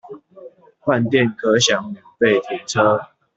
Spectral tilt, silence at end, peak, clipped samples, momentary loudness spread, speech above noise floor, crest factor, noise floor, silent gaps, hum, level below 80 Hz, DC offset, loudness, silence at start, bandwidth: -4 dB/octave; 0.3 s; -2 dBFS; under 0.1%; 9 LU; 25 dB; 18 dB; -42 dBFS; none; none; -60 dBFS; under 0.1%; -18 LUFS; 0.05 s; 8.2 kHz